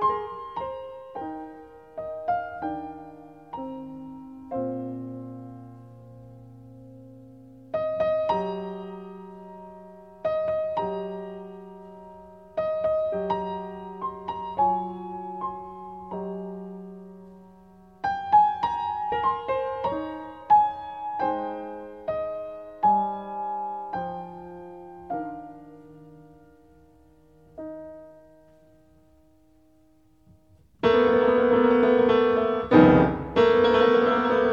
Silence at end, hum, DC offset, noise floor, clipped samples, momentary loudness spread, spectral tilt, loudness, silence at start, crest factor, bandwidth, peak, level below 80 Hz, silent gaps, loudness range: 0 s; none; under 0.1%; -61 dBFS; under 0.1%; 24 LU; -8 dB/octave; -25 LUFS; 0 s; 24 dB; 6.8 kHz; -2 dBFS; -54 dBFS; none; 20 LU